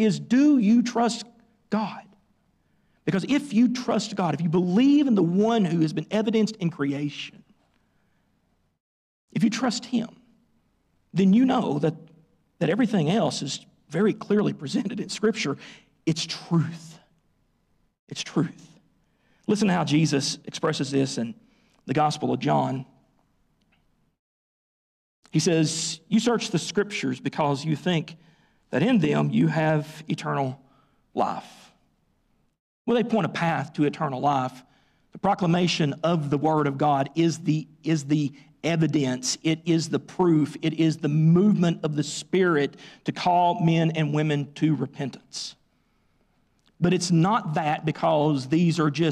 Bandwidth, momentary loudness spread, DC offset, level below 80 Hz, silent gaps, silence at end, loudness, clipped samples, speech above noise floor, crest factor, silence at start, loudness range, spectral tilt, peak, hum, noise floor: 11.5 kHz; 11 LU; under 0.1%; -66 dBFS; 8.80-9.28 s, 17.99-18.07 s, 24.19-25.23 s, 32.59-32.85 s; 0 s; -24 LUFS; under 0.1%; 45 dB; 12 dB; 0 s; 7 LU; -6 dB/octave; -12 dBFS; none; -69 dBFS